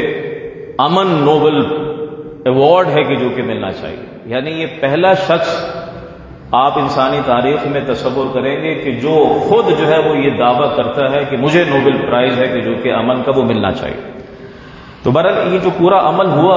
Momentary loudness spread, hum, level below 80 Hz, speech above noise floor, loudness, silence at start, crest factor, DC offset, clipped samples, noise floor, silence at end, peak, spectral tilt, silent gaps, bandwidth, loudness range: 14 LU; none; -44 dBFS; 22 dB; -13 LUFS; 0 s; 14 dB; under 0.1%; under 0.1%; -34 dBFS; 0 s; 0 dBFS; -7 dB/octave; none; 7.6 kHz; 3 LU